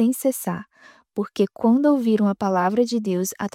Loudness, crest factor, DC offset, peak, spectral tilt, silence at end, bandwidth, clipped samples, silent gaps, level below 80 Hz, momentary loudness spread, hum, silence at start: -21 LUFS; 14 dB; under 0.1%; -8 dBFS; -6 dB/octave; 0.05 s; 16.5 kHz; under 0.1%; none; -68 dBFS; 11 LU; none; 0 s